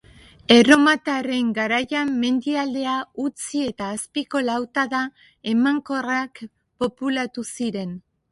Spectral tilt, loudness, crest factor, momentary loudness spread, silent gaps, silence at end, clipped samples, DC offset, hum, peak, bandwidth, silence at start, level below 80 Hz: -3.5 dB/octave; -21 LUFS; 22 dB; 16 LU; none; 0.3 s; under 0.1%; under 0.1%; none; 0 dBFS; 11.5 kHz; 0.5 s; -60 dBFS